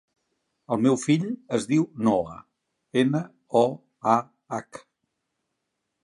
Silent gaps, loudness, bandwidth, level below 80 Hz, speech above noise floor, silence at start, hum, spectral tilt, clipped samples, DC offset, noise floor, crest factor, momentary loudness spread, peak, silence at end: none; -25 LUFS; 11.5 kHz; -66 dBFS; 56 dB; 0.7 s; none; -6.5 dB/octave; under 0.1%; under 0.1%; -80 dBFS; 20 dB; 12 LU; -6 dBFS; 1.25 s